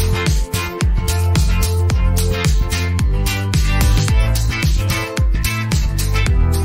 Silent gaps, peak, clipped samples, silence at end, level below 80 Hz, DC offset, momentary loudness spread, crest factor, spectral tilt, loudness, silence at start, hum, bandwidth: none; -4 dBFS; under 0.1%; 0 s; -18 dBFS; under 0.1%; 3 LU; 10 dB; -5 dB/octave; -17 LUFS; 0 s; none; 16.5 kHz